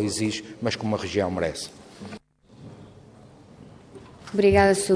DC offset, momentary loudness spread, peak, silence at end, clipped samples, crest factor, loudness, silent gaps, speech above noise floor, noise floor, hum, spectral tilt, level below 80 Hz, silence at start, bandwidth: under 0.1%; 27 LU; -4 dBFS; 0 s; under 0.1%; 22 dB; -24 LUFS; none; 26 dB; -49 dBFS; none; -5 dB/octave; -50 dBFS; 0 s; 11 kHz